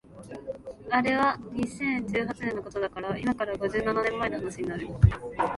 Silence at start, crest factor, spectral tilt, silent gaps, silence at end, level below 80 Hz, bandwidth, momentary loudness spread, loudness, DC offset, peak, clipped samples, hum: 0.1 s; 24 dB; -7 dB/octave; none; 0 s; -42 dBFS; 11.5 kHz; 14 LU; -28 LUFS; under 0.1%; -6 dBFS; under 0.1%; none